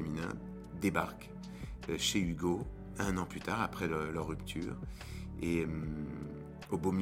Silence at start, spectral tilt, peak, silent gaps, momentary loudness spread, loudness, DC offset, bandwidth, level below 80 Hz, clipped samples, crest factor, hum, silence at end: 0 s; -5 dB/octave; -16 dBFS; none; 12 LU; -38 LUFS; under 0.1%; 16.5 kHz; -50 dBFS; under 0.1%; 22 dB; none; 0 s